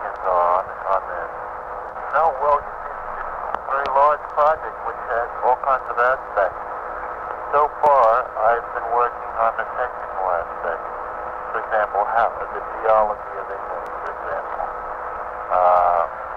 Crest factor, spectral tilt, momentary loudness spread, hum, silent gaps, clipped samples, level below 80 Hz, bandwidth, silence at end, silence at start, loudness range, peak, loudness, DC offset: 16 dB; -5.5 dB/octave; 12 LU; none; none; under 0.1%; -48 dBFS; 7.2 kHz; 0 s; 0 s; 4 LU; -4 dBFS; -21 LUFS; under 0.1%